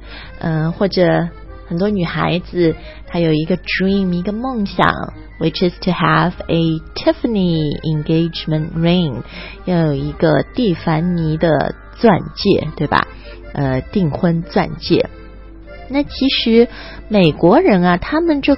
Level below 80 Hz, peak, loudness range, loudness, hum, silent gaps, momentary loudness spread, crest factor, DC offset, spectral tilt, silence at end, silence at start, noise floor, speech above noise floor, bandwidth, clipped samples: -36 dBFS; 0 dBFS; 3 LU; -16 LUFS; none; none; 9 LU; 16 dB; under 0.1%; -9.5 dB/octave; 0 s; 0 s; -35 dBFS; 20 dB; 5.8 kHz; under 0.1%